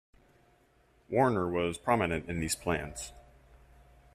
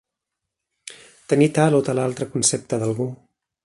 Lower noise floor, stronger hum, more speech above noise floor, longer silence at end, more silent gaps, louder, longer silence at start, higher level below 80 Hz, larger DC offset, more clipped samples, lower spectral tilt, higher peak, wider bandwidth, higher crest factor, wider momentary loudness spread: second, -66 dBFS vs -83 dBFS; neither; second, 35 dB vs 63 dB; first, 0.95 s vs 0.5 s; neither; second, -31 LUFS vs -20 LUFS; first, 1.1 s vs 0.85 s; first, -54 dBFS vs -60 dBFS; neither; neither; about the same, -5 dB/octave vs -5 dB/octave; second, -12 dBFS vs -2 dBFS; first, 14.5 kHz vs 11.5 kHz; about the same, 20 dB vs 20 dB; second, 12 LU vs 23 LU